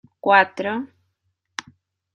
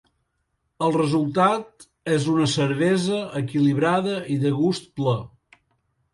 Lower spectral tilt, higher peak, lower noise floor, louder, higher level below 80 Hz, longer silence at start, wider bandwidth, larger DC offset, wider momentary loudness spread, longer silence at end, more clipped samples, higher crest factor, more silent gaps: second, -4 dB/octave vs -6 dB/octave; first, -2 dBFS vs -6 dBFS; about the same, -73 dBFS vs -74 dBFS; first, -19 LUFS vs -22 LUFS; second, -76 dBFS vs -60 dBFS; second, 0.25 s vs 0.8 s; second, 10 kHz vs 11.5 kHz; neither; first, 19 LU vs 6 LU; first, 1.3 s vs 0.85 s; neither; first, 22 dB vs 16 dB; neither